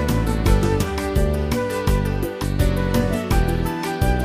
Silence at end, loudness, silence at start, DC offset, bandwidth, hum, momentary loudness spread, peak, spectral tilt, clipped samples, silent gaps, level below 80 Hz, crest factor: 0 s; -21 LUFS; 0 s; under 0.1%; 15.5 kHz; none; 4 LU; -4 dBFS; -6.5 dB/octave; under 0.1%; none; -24 dBFS; 16 dB